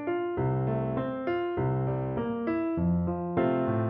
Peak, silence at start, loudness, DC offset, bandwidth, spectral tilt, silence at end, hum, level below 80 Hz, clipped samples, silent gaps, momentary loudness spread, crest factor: -16 dBFS; 0 s; -29 LUFS; under 0.1%; 3.8 kHz; -8.5 dB/octave; 0 s; none; -50 dBFS; under 0.1%; none; 4 LU; 12 dB